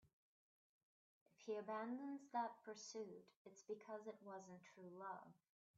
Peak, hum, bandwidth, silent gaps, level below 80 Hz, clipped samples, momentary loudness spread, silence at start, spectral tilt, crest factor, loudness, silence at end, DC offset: -32 dBFS; none; 7.4 kHz; 0.13-1.26 s, 3.36-3.45 s; under -90 dBFS; under 0.1%; 14 LU; 0.05 s; -4 dB/octave; 22 dB; -53 LUFS; 0.45 s; under 0.1%